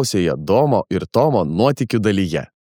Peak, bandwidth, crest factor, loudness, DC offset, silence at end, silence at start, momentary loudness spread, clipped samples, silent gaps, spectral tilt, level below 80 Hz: -2 dBFS; 19 kHz; 14 dB; -18 LUFS; under 0.1%; 0.3 s; 0 s; 4 LU; under 0.1%; none; -6 dB/octave; -48 dBFS